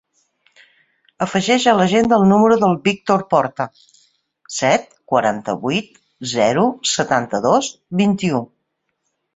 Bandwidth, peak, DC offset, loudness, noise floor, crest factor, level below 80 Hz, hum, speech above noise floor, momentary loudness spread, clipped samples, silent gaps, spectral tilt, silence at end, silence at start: 8 kHz; -2 dBFS; under 0.1%; -17 LUFS; -73 dBFS; 16 dB; -56 dBFS; none; 56 dB; 11 LU; under 0.1%; none; -5 dB/octave; 0.9 s; 1.2 s